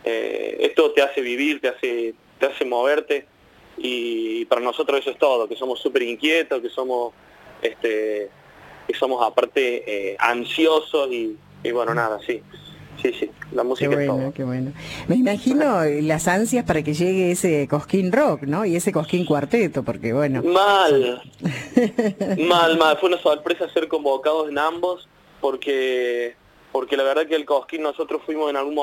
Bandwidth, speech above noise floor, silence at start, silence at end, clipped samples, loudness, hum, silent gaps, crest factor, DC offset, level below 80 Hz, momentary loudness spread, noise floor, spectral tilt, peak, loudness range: 17 kHz; 24 dB; 0.05 s; 0 s; under 0.1%; -21 LUFS; none; none; 20 dB; under 0.1%; -58 dBFS; 10 LU; -45 dBFS; -5 dB/octave; -2 dBFS; 5 LU